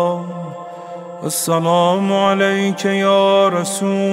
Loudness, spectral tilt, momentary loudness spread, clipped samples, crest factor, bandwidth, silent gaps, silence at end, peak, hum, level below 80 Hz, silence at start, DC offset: -16 LUFS; -4.5 dB/octave; 17 LU; under 0.1%; 14 dB; 16 kHz; none; 0 s; -2 dBFS; none; -68 dBFS; 0 s; under 0.1%